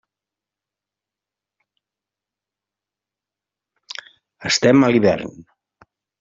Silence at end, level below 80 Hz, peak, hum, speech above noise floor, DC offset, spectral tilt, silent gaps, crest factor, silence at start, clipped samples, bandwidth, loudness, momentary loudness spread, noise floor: 0.8 s; -60 dBFS; -2 dBFS; 50 Hz at -60 dBFS; 72 dB; under 0.1%; -4.5 dB/octave; none; 20 dB; 4.4 s; under 0.1%; 7.8 kHz; -16 LUFS; 21 LU; -88 dBFS